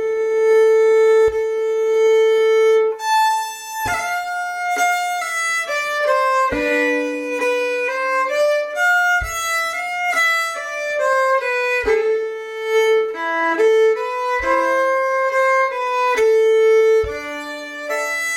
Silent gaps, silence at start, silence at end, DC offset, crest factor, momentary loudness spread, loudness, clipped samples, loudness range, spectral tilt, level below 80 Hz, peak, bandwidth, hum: none; 0 s; 0 s; under 0.1%; 12 dB; 9 LU; -17 LUFS; under 0.1%; 3 LU; -2 dB/octave; -46 dBFS; -6 dBFS; 17 kHz; none